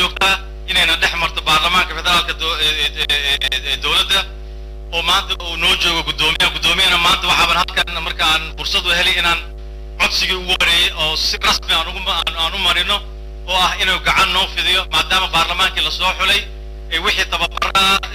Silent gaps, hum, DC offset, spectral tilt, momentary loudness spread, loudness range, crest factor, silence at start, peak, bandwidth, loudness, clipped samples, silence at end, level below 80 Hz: none; none; under 0.1%; -1.5 dB/octave; 7 LU; 2 LU; 12 dB; 0 s; -4 dBFS; 16 kHz; -14 LUFS; under 0.1%; 0 s; -30 dBFS